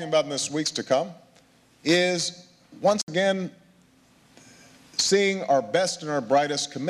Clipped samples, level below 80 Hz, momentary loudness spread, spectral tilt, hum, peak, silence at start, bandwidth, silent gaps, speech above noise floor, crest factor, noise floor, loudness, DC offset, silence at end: under 0.1%; -72 dBFS; 9 LU; -3 dB/octave; none; -10 dBFS; 0 s; 14 kHz; 3.03-3.07 s; 34 dB; 16 dB; -58 dBFS; -24 LUFS; under 0.1%; 0 s